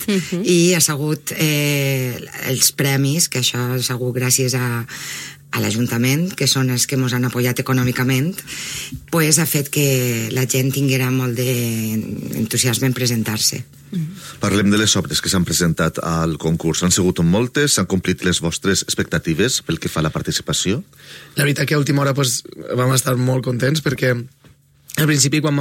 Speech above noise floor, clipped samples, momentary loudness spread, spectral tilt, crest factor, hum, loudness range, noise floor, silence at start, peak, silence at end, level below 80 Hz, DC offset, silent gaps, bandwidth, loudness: 32 dB; under 0.1%; 10 LU; -4 dB/octave; 18 dB; none; 2 LU; -50 dBFS; 0 s; 0 dBFS; 0 s; -46 dBFS; under 0.1%; none; 16.5 kHz; -18 LUFS